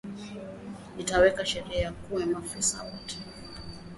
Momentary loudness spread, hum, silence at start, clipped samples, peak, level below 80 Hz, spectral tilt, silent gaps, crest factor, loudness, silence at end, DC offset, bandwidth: 19 LU; none; 0.05 s; under 0.1%; -8 dBFS; -48 dBFS; -3 dB/octave; none; 22 dB; -29 LUFS; 0 s; under 0.1%; 11.5 kHz